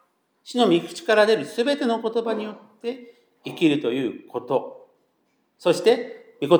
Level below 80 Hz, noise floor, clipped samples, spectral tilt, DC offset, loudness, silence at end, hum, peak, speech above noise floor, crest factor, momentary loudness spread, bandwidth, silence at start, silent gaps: -86 dBFS; -69 dBFS; under 0.1%; -5 dB/octave; under 0.1%; -23 LUFS; 0 s; none; -4 dBFS; 46 dB; 20 dB; 16 LU; over 20 kHz; 0.45 s; none